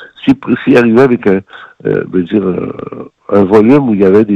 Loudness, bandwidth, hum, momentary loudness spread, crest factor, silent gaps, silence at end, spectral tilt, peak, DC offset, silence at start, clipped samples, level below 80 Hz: -10 LUFS; 8.2 kHz; none; 14 LU; 10 dB; none; 0 s; -8.5 dB/octave; 0 dBFS; under 0.1%; 0 s; 0.8%; -48 dBFS